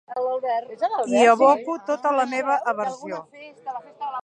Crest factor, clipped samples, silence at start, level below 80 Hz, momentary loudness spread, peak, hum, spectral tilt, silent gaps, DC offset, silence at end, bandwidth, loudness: 20 dB; under 0.1%; 0.1 s; -80 dBFS; 18 LU; -2 dBFS; none; -4 dB/octave; none; under 0.1%; 0.05 s; 9.8 kHz; -21 LUFS